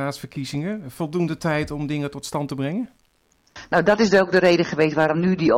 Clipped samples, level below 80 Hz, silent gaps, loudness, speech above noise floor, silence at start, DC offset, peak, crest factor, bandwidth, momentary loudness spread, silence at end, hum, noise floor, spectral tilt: under 0.1%; -52 dBFS; none; -21 LUFS; 42 dB; 0 s; under 0.1%; -6 dBFS; 16 dB; 16.5 kHz; 13 LU; 0 s; none; -63 dBFS; -6 dB/octave